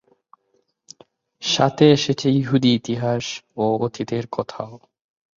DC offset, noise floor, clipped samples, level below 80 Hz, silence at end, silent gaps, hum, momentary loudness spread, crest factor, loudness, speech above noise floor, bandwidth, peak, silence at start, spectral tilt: under 0.1%; -68 dBFS; under 0.1%; -58 dBFS; 0.6 s; none; none; 14 LU; 20 dB; -20 LUFS; 48 dB; 7.6 kHz; -2 dBFS; 1.4 s; -5.5 dB/octave